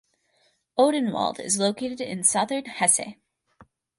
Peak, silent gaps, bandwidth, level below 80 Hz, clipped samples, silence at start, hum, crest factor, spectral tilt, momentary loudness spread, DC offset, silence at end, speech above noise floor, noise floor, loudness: -4 dBFS; none; 11.5 kHz; -70 dBFS; under 0.1%; 0.75 s; none; 22 dB; -2.5 dB/octave; 10 LU; under 0.1%; 0.35 s; 43 dB; -67 dBFS; -23 LUFS